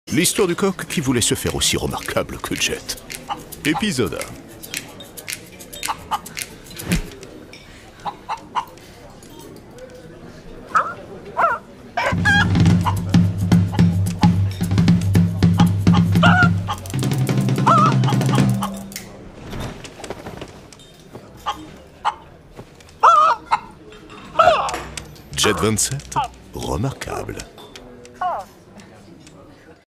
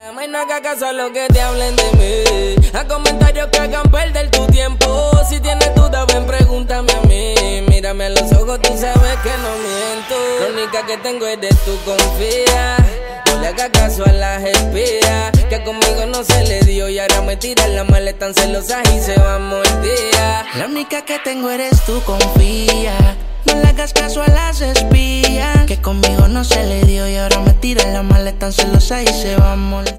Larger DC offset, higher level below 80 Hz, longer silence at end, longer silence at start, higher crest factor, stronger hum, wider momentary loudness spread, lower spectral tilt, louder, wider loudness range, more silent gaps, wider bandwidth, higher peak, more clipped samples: neither; second, -40 dBFS vs -16 dBFS; first, 0.15 s vs 0 s; about the same, 0.05 s vs 0.05 s; first, 20 dB vs 12 dB; neither; first, 24 LU vs 7 LU; about the same, -5 dB/octave vs -4.5 dB/octave; second, -19 LUFS vs -14 LUFS; first, 14 LU vs 2 LU; neither; about the same, 16 kHz vs 16.5 kHz; about the same, 0 dBFS vs 0 dBFS; neither